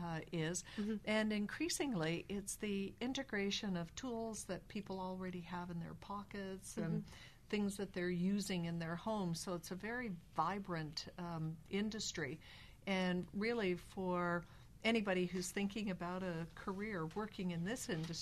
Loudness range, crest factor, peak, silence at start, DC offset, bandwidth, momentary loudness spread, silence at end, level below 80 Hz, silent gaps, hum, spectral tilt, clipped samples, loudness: 5 LU; 18 dB; -24 dBFS; 0 s; under 0.1%; 13.5 kHz; 8 LU; 0 s; -64 dBFS; none; none; -5 dB/octave; under 0.1%; -42 LUFS